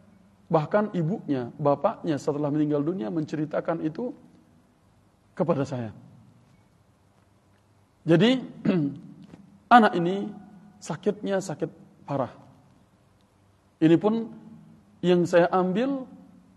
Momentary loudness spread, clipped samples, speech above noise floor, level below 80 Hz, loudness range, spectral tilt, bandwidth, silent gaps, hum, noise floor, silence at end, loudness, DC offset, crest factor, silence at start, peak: 15 LU; under 0.1%; 37 dB; -70 dBFS; 9 LU; -7 dB/octave; 11.5 kHz; none; none; -61 dBFS; 0.4 s; -25 LUFS; under 0.1%; 24 dB; 0.5 s; -2 dBFS